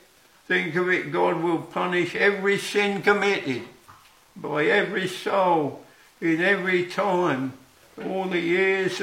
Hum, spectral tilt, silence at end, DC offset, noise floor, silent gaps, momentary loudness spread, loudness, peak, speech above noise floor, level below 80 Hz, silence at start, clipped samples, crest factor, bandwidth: none; -5 dB/octave; 0 s; under 0.1%; -52 dBFS; none; 9 LU; -23 LUFS; -4 dBFS; 29 dB; -70 dBFS; 0.5 s; under 0.1%; 20 dB; 16 kHz